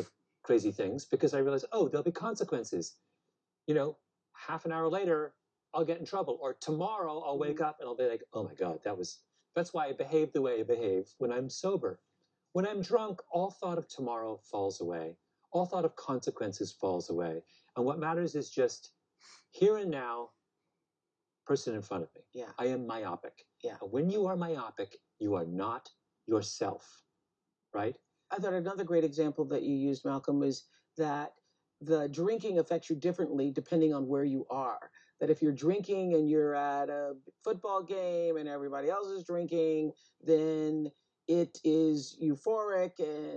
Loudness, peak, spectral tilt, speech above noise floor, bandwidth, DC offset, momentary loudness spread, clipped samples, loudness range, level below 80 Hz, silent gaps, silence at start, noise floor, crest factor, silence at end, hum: -34 LUFS; -16 dBFS; -6.5 dB/octave; 56 dB; 8.6 kHz; under 0.1%; 12 LU; under 0.1%; 5 LU; -84 dBFS; none; 0 s; -89 dBFS; 18 dB; 0 s; none